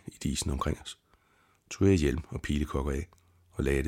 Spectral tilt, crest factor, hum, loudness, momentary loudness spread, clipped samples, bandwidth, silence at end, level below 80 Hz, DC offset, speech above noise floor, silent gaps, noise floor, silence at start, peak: -6 dB/octave; 18 dB; none; -31 LUFS; 19 LU; under 0.1%; 16 kHz; 0 s; -40 dBFS; under 0.1%; 38 dB; none; -67 dBFS; 0.05 s; -12 dBFS